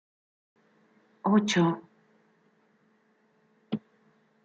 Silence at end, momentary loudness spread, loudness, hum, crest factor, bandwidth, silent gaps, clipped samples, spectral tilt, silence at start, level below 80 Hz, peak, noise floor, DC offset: 0.65 s; 14 LU; -28 LUFS; none; 22 dB; 7.4 kHz; none; under 0.1%; -5 dB/octave; 1.25 s; -78 dBFS; -12 dBFS; -68 dBFS; under 0.1%